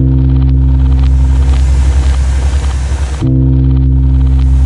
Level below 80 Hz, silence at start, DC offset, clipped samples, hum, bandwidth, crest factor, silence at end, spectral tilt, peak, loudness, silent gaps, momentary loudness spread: -10 dBFS; 0 s; under 0.1%; under 0.1%; none; 10 kHz; 8 dB; 0 s; -7.5 dB/octave; 0 dBFS; -11 LUFS; none; 4 LU